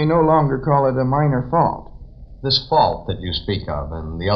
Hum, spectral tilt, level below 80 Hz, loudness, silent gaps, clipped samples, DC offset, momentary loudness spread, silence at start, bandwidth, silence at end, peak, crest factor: none; -8 dB/octave; -36 dBFS; -19 LUFS; none; under 0.1%; under 0.1%; 12 LU; 0 s; 6 kHz; 0 s; -2 dBFS; 16 dB